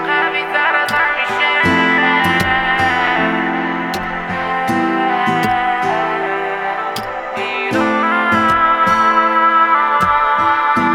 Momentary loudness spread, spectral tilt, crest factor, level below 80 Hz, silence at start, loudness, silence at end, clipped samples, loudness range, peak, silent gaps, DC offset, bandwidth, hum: 8 LU; -4.5 dB/octave; 14 dB; -44 dBFS; 0 s; -14 LUFS; 0 s; under 0.1%; 4 LU; -2 dBFS; none; under 0.1%; 18.5 kHz; none